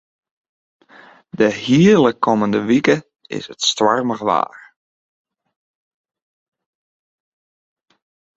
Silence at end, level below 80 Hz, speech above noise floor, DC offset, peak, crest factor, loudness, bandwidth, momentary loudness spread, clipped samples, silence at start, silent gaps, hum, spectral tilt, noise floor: 3.9 s; -60 dBFS; 31 dB; under 0.1%; -2 dBFS; 18 dB; -16 LUFS; 8.2 kHz; 16 LU; under 0.1%; 1.35 s; none; none; -5 dB/octave; -46 dBFS